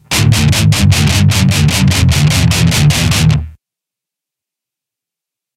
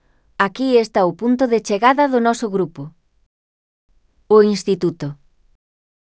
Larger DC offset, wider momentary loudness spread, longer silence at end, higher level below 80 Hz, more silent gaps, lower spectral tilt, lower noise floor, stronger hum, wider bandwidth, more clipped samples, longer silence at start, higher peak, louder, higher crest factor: neither; second, 2 LU vs 16 LU; first, 2.05 s vs 1 s; first, -24 dBFS vs -60 dBFS; second, none vs 3.26-3.89 s; about the same, -4.5 dB/octave vs -5.5 dB/octave; second, -84 dBFS vs under -90 dBFS; neither; first, 16 kHz vs 8 kHz; neither; second, 0.1 s vs 0.4 s; about the same, 0 dBFS vs 0 dBFS; first, -10 LUFS vs -17 LUFS; second, 12 dB vs 18 dB